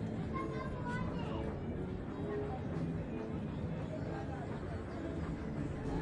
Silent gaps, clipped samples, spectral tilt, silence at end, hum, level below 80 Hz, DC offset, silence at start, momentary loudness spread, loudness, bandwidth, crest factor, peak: none; under 0.1%; -8.5 dB/octave; 0 s; none; -50 dBFS; under 0.1%; 0 s; 3 LU; -41 LUFS; 10.5 kHz; 12 dB; -26 dBFS